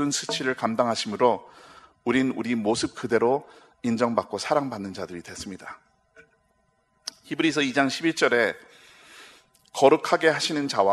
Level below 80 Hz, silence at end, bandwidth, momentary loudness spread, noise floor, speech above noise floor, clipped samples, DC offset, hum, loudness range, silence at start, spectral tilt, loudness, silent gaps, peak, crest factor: -66 dBFS; 0 s; 13 kHz; 16 LU; -68 dBFS; 44 dB; under 0.1%; under 0.1%; none; 7 LU; 0 s; -4 dB/octave; -24 LUFS; none; -2 dBFS; 22 dB